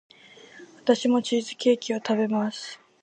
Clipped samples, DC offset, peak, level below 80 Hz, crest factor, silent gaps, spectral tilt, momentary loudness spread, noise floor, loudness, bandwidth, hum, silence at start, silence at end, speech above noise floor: under 0.1%; under 0.1%; -6 dBFS; -78 dBFS; 20 dB; none; -4.5 dB/octave; 9 LU; -50 dBFS; -25 LUFS; 9.6 kHz; none; 0.55 s; 0.25 s; 26 dB